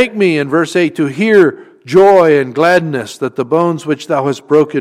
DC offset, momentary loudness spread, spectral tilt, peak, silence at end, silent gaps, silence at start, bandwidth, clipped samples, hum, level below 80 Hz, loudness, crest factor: under 0.1%; 10 LU; -6 dB/octave; 0 dBFS; 0 s; none; 0 s; 14 kHz; under 0.1%; none; -56 dBFS; -12 LUFS; 12 dB